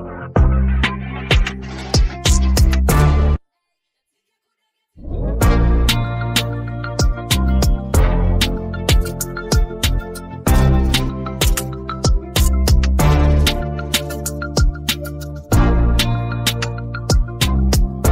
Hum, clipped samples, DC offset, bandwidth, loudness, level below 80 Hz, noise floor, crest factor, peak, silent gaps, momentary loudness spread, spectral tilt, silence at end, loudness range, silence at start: none; under 0.1%; under 0.1%; 16.5 kHz; -18 LUFS; -18 dBFS; -75 dBFS; 14 dB; -2 dBFS; none; 9 LU; -5 dB/octave; 0 s; 3 LU; 0 s